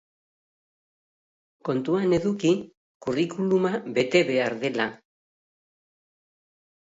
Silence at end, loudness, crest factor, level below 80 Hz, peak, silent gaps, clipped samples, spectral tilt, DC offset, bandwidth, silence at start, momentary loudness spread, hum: 1.9 s; -25 LUFS; 20 dB; -62 dBFS; -6 dBFS; 2.77-3.00 s; under 0.1%; -6 dB/octave; under 0.1%; 7.8 kHz; 1.65 s; 8 LU; none